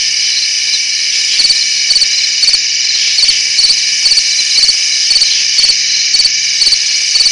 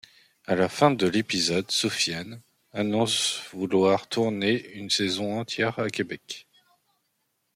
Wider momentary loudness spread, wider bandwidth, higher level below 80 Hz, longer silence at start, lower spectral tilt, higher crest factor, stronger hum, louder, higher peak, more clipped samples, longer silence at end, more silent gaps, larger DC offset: second, 3 LU vs 13 LU; second, 11.5 kHz vs 16 kHz; first, -48 dBFS vs -68 dBFS; second, 0 s vs 0.5 s; second, 4 dB/octave vs -4 dB/octave; second, 10 dB vs 22 dB; first, 60 Hz at -55 dBFS vs none; first, -7 LUFS vs -25 LUFS; first, 0 dBFS vs -6 dBFS; neither; second, 0 s vs 1.15 s; neither; first, 0.1% vs under 0.1%